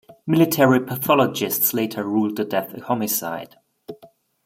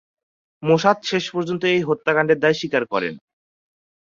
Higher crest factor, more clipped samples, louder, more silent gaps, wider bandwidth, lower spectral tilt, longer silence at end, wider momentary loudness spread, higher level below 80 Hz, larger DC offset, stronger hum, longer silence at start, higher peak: about the same, 20 dB vs 20 dB; neither; about the same, -20 LUFS vs -20 LUFS; neither; first, 16.5 kHz vs 7.6 kHz; about the same, -5 dB/octave vs -5.5 dB/octave; second, 0.4 s vs 1 s; first, 15 LU vs 8 LU; about the same, -66 dBFS vs -64 dBFS; neither; neither; second, 0.1 s vs 0.6 s; about the same, -2 dBFS vs -2 dBFS